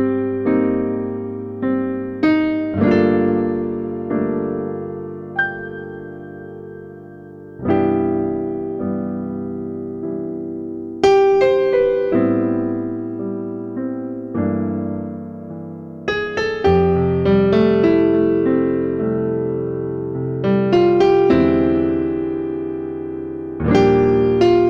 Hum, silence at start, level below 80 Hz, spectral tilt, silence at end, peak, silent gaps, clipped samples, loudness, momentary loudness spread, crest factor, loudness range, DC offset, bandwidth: none; 0 s; -44 dBFS; -8 dB/octave; 0 s; -2 dBFS; none; under 0.1%; -18 LUFS; 15 LU; 16 dB; 8 LU; under 0.1%; 7 kHz